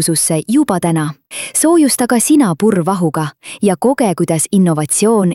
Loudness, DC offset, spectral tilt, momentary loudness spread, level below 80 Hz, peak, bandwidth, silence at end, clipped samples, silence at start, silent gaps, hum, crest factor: -13 LUFS; 0.1%; -5 dB/octave; 7 LU; -56 dBFS; -2 dBFS; 16.5 kHz; 0 s; under 0.1%; 0 s; none; none; 12 dB